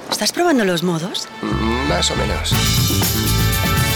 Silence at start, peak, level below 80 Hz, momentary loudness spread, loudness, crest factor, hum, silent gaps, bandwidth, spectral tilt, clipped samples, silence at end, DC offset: 0 s; -6 dBFS; -28 dBFS; 6 LU; -17 LUFS; 12 dB; none; none; over 20 kHz; -4 dB/octave; under 0.1%; 0 s; under 0.1%